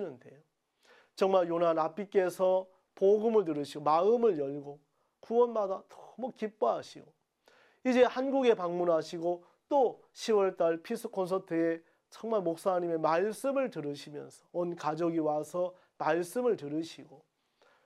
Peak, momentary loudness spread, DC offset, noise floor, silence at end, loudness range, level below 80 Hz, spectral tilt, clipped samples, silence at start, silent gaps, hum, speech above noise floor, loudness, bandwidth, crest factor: -12 dBFS; 14 LU; under 0.1%; -69 dBFS; 0.7 s; 4 LU; -84 dBFS; -6 dB/octave; under 0.1%; 0 s; none; none; 38 dB; -31 LUFS; 14 kHz; 18 dB